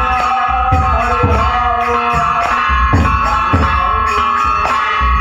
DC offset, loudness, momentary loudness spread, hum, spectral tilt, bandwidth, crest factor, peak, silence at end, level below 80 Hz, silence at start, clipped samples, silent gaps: under 0.1%; -13 LUFS; 1 LU; none; -6 dB/octave; 10 kHz; 12 dB; 0 dBFS; 0 s; -20 dBFS; 0 s; under 0.1%; none